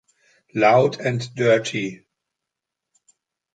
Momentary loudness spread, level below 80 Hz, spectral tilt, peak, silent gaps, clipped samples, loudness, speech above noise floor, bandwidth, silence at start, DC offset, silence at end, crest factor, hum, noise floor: 13 LU; -66 dBFS; -5.5 dB/octave; -4 dBFS; none; under 0.1%; -20 LUFS; 65 dB; 9.2 kHz; 0.55 s; under 0.1%; 1.6 s; 20 dB; none; -84 dBFS